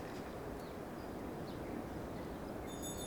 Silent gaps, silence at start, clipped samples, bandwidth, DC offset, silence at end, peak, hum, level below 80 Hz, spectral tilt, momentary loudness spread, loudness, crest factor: none; 0 s; under 0.1%; over 20 kHz; under 0.1%; 0 s; -32 dBFS; none; -56 dBFS; -5 dB/octave; 2 LU; -46 LUFS; 14 dB